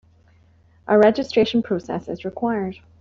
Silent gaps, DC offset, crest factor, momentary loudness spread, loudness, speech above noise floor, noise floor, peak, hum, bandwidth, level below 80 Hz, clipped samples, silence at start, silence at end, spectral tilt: none; under 0.1%; 18 dB; 14 LU; -21 LUFS; 35 dB; -55 dBFS; -4 dBFS; none; 7.4 kHz; -56 dBFS; under 0.1%; 0.85 s; 0.25 s; -6.5 dB/octave